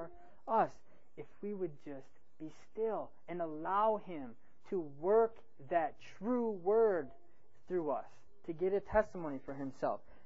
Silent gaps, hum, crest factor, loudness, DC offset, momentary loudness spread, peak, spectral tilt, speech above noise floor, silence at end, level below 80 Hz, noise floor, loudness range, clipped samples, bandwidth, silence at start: none; none; 20 dB; -37 LUFS; 0.4%; 20 LU; -18 dBFS; -6 dB/octave; 19 dB; 0.3 s; -64 dBFS; -55 dBFS; 5 LU; under 0.1%; 7.4 kHz; 0 s